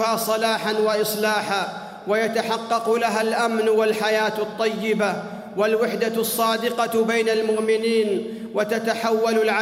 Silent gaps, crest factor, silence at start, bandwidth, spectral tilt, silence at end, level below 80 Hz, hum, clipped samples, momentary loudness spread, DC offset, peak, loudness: none; 14 dB; 0 s; 16 kHz; -3.5 dB/octave; 0 s; -70 dBFS; none; under 0.1%; 5 LU; under 0.1%; -8 dBFS; -22 LUFS